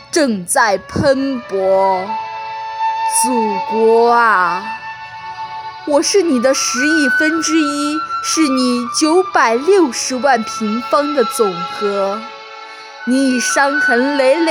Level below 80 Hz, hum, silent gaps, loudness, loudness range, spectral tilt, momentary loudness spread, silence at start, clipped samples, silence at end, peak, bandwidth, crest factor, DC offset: -52 dBFS; none; none; -14 LUFS; 3 LU; -3 dB/octave; 14 LU; 0 s; under 0.1%; 0 s; 0 dBFS; over 20 kHz; 14 dB; under 0.1%